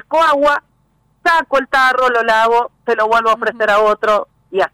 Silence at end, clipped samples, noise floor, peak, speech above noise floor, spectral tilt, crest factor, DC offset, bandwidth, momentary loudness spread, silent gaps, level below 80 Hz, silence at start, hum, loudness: 0.05 s; under 0.1%; -58 dBFS; -6 dBFS; 45 dB; -3 dB/octave; 8 dB; under 0.1%; 16.5 kHz; 7 LU; none; -50 dBFS; 0.1 s; none; -14 LUFS